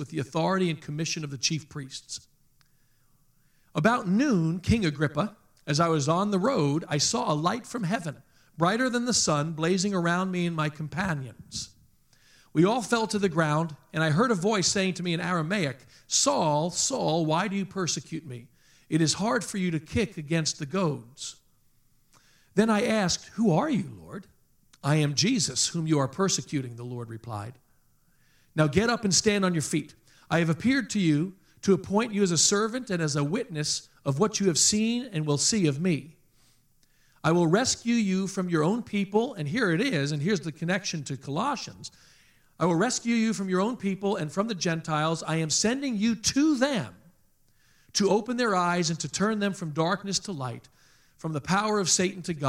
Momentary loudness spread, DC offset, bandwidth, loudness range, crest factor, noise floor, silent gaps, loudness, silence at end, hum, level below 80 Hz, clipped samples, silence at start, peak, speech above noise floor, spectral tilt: 12 LU; under 0.1%; 15 kHz; 4 LU; 20 dB; -64 dBFS; none; -26 LUFS; 0 s; none; -60 dBFS; under 0.1%; 0 s; -6 dBFS; 37 dB; -4 dB/octave